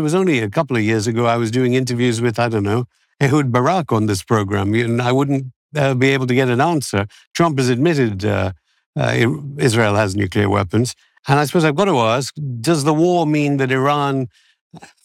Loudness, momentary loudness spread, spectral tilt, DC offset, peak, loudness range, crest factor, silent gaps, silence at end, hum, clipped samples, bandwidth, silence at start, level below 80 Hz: -17 LUFS; 7 LU; -6 dB/octave; under 0.1%; -2 dBFS; 1 LU; 16 dB; 5.56-5.69 s, 7.27-7.31 s, 8.86-8.93 s, 14.61-14.71 s; 0.2 s; none; under 0.1%; 15.5 kHz; 0 s; -58 dBFS